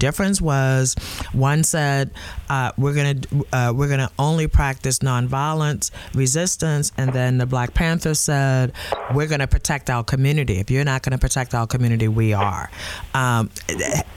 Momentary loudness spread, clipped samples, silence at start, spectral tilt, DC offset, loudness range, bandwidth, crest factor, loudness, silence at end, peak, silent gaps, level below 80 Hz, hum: 6 LU; under 0.1%; 0 s; -5 dB/octave; under 0.1%; 1 LU; 16 kHz; 14 dB; -20 LUFS; 0 s; -6 dBFS; none; -32 dBFS; none